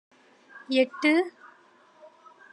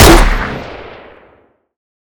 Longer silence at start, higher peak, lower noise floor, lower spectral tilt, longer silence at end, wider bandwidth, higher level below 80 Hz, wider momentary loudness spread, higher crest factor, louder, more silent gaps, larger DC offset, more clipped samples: first, 0.55 s vs 0 s; second, -10 dBFS vs 0 dBFS; first, -58 dBFS vs -50 dBFS; about the same, -3 dB/octave vs -4 dB/octave; about the same, 1.25 s vs 1.25 s; second, 11 kHz vs over 20 kHz; second, under -90 dBFS vs -16 dBFS; second, 14 LU vs 26 LU; first, 20 dB vs 12 dB; second, -25 LUFS vs -12 LUFS; neither; neither; second, under 0.1% vs 3%